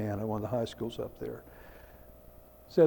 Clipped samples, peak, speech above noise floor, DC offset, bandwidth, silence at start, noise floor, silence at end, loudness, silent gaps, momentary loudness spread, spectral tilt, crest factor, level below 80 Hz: under 0.1%; -12 dBFS; 19 dB; under 0.1%; 18 kHz; 0 s; -54 dBFS; 0 s; -36 LUFS; none; 21 LU; -7.5 dB/octave; 22 dB; -58 dBFS